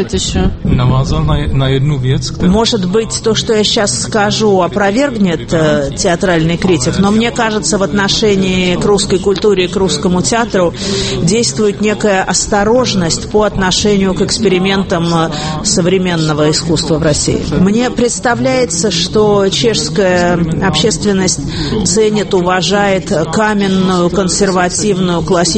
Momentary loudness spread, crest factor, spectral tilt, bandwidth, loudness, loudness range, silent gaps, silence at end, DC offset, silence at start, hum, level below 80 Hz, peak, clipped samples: 3 LU; 12 dB; -4.5 dB/octave; 8.8 kHz; -12 LUFS; 1 LU; none; 0 s; under 0.1%; 0 s; none; -28 dBFS; 0 dBFS; under 0.1%